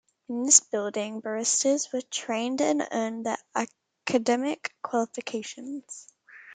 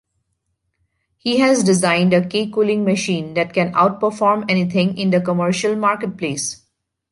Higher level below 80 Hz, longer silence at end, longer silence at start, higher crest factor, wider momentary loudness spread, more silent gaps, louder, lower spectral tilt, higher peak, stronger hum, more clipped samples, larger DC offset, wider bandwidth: second, -80 dBFS vs -60 dBFS; second, 0 s vs 0.55 s; second, 0.3 s vs 1.25 s; first, 26 dB vs 16 dB; first, 18 LU vs 8 LU; neither; second, -26 LUFS vs -18 LUFS; second, -1.5 dB/octave vs -5 dB/octave; about the same, -2 dBFS vs -2 dBFS; neither; neither; neither; second, 10 kHz vs 11.5 kHz